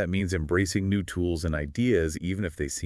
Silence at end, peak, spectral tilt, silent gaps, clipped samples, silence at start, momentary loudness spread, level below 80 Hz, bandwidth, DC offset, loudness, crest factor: 0 s; -10 dBFS; -5.5 dB/octave; none; under 0.1%; 0 s; 6 LU; -44 dBFS; 12 kHz; under 0.1%; -27 LUFS; 16 dB